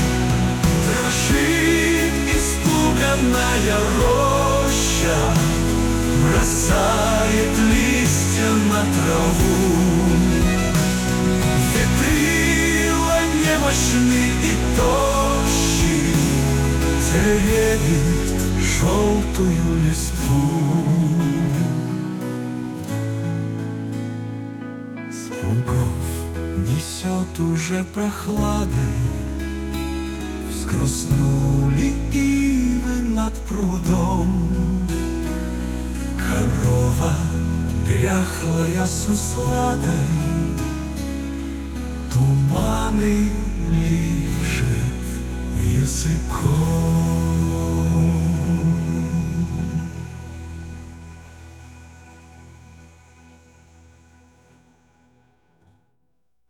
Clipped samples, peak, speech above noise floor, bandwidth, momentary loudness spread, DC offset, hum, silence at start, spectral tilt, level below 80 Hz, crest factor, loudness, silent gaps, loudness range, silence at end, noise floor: under 0.1%; -6 dBFS; 55 dB; 19 kHz; 10 LU; under 0.1%; none; 0 s; -5 dB/octave; -28 dBFS; 14 dB; -20 LUFS; none; 7 LU; 4 s; -73 dBFS